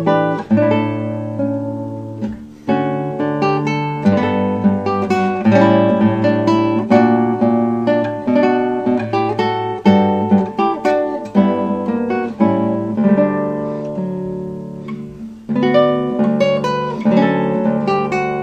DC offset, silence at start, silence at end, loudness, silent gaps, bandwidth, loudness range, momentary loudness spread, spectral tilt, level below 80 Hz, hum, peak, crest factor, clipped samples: under 0.1%; 0 s; 0 s; -16 LUFS; none; 8 kHz; 5 LU; 11 LU; -8 dB/octave; -52 dBFS; none; 0 dBFS; 16 dB; under 0.1%